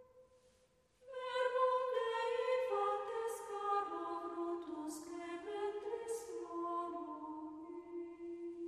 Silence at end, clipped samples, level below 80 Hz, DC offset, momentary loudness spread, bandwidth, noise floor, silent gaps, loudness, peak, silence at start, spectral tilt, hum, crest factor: 0 s; under 0.1%; -82 dBFS; under 0.1%; 12 LU; 13 kHz; -73 dBFS; none; -41 LUFS; -24 dBFS; 0 s; -3 dB/octave; none; 18 dB